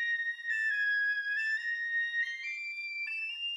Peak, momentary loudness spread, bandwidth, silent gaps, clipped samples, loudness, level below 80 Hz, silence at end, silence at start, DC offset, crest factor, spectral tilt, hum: -24 dBFS; 7 LU; 12 kHz; none; under 0.1%; -31 LUFS; under -90 dBFS; 0 s; 0 s; under 0.1%; 10 dB; 7 dB/octave; none